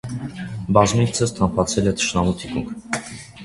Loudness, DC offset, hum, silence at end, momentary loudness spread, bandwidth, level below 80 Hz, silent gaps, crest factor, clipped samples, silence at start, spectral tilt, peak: -21 LUFS; under 0.1%; none; 0 s; 13 LU; 11.5 kHz; -40 dBFS; none; 20 dB; under 0.1%; 0.05 s; -5 dB/octave; 0 dBFS